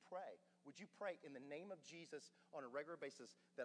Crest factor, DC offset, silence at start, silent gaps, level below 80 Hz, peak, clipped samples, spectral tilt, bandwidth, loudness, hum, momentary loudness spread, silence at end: 18 dB; under 0.1%; 0 s; none; under -90 dBFS; -36 dBFS; under 0.1%; -4 dB/octave; 10 kHz; -55 LUFS; none; 10 LU; 0 s